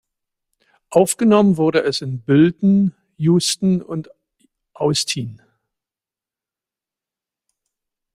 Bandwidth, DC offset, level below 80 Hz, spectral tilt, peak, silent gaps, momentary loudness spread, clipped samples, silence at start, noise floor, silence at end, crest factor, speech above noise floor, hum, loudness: 15.5 kHz; under 0.1%; -60 dBFS; -5.5 dB/octave; -2 dBFS; none; 10 LU; under 0.1%; 0.9 s; -90 dBFS; 2.8 s; 18 dB; 73 dB; none; -17 LUFS